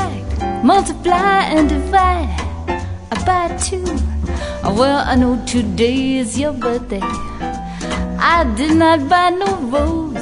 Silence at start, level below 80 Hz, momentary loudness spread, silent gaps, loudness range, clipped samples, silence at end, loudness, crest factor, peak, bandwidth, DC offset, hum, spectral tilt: 0 s; -26 dBFS; 10 LU; none; 2 LU; under 0.1%; 0 s; -16 LUFS; 14 dB; -2 dBFS; 11 kHz; under 0.1%; none; -5 dB/octave